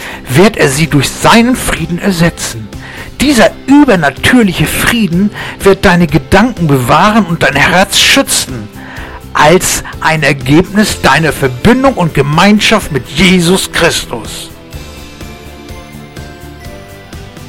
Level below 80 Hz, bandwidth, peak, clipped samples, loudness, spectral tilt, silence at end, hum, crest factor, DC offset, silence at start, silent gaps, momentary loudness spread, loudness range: -28 dBFS; 17 kHz; 0 dBFS; 0.5%; -8 LUFS; -4.5 dB/octave; 0 s; none; 10 dB; 1%; 0 s; none; 22 LU; 5 LU